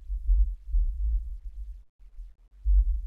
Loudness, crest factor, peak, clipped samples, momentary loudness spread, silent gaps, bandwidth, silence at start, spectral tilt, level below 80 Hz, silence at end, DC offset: -31 LUFS; 14 dB; -14 dBFS; under 0.1%; 23 LU; 1.89-1.99 s; 0.2 kHz; 0 s; -9 dB/octave; -28 dBFS; 0 s; 0.3%